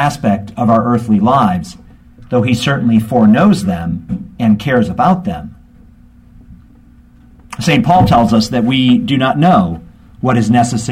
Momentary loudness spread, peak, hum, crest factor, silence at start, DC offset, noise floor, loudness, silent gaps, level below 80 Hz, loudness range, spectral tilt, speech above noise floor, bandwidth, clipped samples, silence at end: 11 LU; 0 dBFS; none; 12 dB; 0 s; under 0.1%; -42 dBFS; -12 LUFS; none; -38 dBFS; 6 LU; -6.5 dB/octave; 31 dB; 14.5 kHz; under 0.1%; 0 s